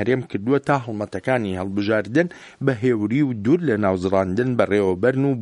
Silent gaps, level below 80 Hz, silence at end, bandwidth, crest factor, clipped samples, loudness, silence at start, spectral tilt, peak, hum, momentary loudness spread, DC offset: none; -58 dBFS; 0 s; 11 kHz; 18 dB; under 0.1%; -21 LUFS; 0 s; -8 dB/octave; -2 dBFS; none; 5 LU; under 0.1%